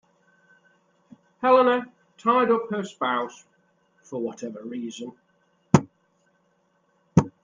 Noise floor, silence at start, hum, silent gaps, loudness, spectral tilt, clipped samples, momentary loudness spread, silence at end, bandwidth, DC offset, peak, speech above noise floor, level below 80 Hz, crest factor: -68 dBFS; 1.4 s; none; none; -24 LUFS; -6.5 dB/octave; under 0.1%; 18 LU; 0.15 s; 9.6 kHz; under 0.1%; -2 dBFS; 44 dB; -60 dBFS; 24 dB